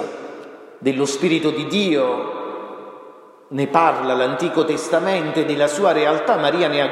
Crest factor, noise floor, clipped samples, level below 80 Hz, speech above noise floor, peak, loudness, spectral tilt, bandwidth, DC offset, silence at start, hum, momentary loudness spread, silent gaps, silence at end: 18 dB; -43 dBFS; under 0.1%; -72 dBFS; 25 dB; -2 dBFS; -19 LUFS; -4.5 dB/octave; 13.5 kHz; under 0.1%; 0 s; none; 17 LU; none; 0 s